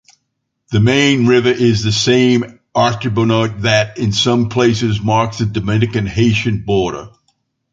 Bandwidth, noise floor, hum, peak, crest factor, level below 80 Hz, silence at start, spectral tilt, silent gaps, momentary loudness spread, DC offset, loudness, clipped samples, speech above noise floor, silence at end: 7.8 kHz; -71 dBFS; none; 0 dBFS; 14 dB; -40 dBFS; 0.7 s; -5.5 dB/octave; none; 6 LU; under 0.1%; -14 LUFS; under 0.1%; 58 dB; 0.65 s